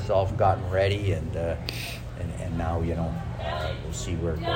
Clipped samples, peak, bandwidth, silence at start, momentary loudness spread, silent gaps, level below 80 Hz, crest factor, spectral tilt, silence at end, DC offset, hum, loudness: under 0.1%; -10 dBFS; 16 kHz; 0 s; 10 LU; none; -40 dBFS; 18 dB; -6 dB/octave; 0 s; under 0.1%; none; -28 LUFS